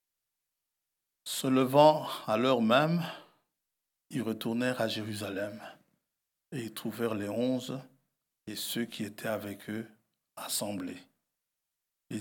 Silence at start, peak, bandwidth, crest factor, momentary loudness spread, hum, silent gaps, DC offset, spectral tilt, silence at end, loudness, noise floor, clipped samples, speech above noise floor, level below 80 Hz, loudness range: 1.25 s; -10 dBFS; 19 kHz; 22 dB; 18 LU; none; none; under 0.1%; -5 dB/octave; 0 s; -31 LUFS; -87 dBFS; under 0.1%; 56 dB; -84 dBFS; 9 LU